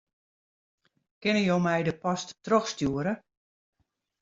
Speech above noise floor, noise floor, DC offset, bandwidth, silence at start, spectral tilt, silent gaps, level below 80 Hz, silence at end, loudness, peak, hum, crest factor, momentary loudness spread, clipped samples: over 63 dB; under -90 dBFS; under 0.1%; 7.8 kHz; 1.2 s; -5.5 dB/octave; none; -62 dBFS; 1.05 s; -28 LUFS; -10 dBFS; none; 20 dB; 8 LU; under 0.1%